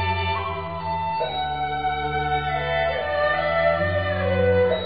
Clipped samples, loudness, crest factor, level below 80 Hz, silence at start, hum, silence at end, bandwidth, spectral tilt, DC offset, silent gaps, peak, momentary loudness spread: under 0.1%; -23 LUFS; 14 dB; -42 dBFS; 0 s; none; 0 s; 5.2 kHz; -3.5 dB/octave; 0.5%; none; -10 dBFS; 6 LU